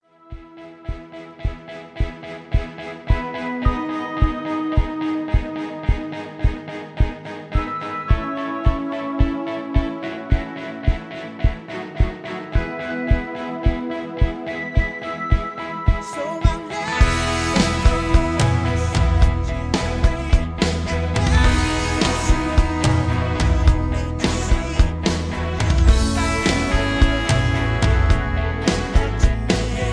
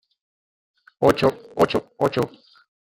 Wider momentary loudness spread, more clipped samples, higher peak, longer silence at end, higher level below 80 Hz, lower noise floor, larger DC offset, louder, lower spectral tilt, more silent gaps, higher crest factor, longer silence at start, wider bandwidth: first, 11 LU vs 7 LU; neither; about the same, -2 dBFS vs -2 dBFS; second, 0 s vs 0.55 s; first, -22 dBFS vs -54 dBFS; second, -40 dBFS vs under -90 dBFS; neither; about the same, -21 LUFS vs -22 LUFS; about the same, -5.5 dB/octave vs -6 dB/octave; neither; about the same, 18 dB vs 22 dB; second, 0.3 s vs 1 s; second, 11 kHz vs 17 kHz